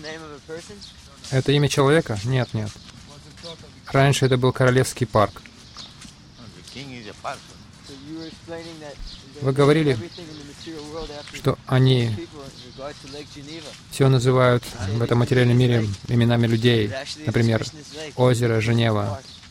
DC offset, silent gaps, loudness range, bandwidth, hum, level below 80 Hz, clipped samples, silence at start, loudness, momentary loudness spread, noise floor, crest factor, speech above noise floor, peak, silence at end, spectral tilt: under 0.1%; none; 9 LU; 14.5 kHz; none; -48 dBFS; under 0.1%; 0 s; -20 LUFS; 21 LU; -44 dBFS; 18 dB; 23 dB; -4 dBFS; 0 s; -6 dB/octave